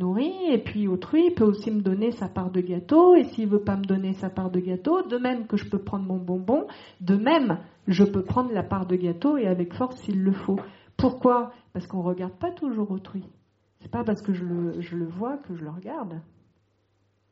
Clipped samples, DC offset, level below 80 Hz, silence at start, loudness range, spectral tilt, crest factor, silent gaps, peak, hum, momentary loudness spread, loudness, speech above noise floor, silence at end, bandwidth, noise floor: under 0.1%; under 0.1%; -56 dBFS; 0 s; 9 LU; -7 dB/octave; 18 dB; none; -6 dBFS; none; 13 LU; -25 LUFS; 44 dB; 1.1 s; 7.2 kHz; -68 dBFS